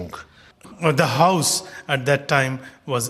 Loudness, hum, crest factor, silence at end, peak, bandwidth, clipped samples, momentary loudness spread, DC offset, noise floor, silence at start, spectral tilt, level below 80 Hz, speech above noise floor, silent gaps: -20 LUFS; none; 20 dB; 0 s; -2 dBFS; 14.5 kHz; under 0.1%; 14 LU; under 0.1%; -41 dBFS; 0 s; -4 dB/octave; -60 dBFS; 21 dB; none